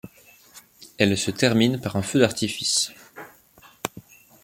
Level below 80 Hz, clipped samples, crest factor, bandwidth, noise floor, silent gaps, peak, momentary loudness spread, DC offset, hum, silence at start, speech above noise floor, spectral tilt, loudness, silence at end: -60 dBFS; under 0.1%; 22 dB; 17 kHz; -53 dBFS; none; -4 dBFS; 16 LU; under 0.1%; none; 0.05 s; 32 dB; -4 dB/octave; -23 LUFS; 0.45 s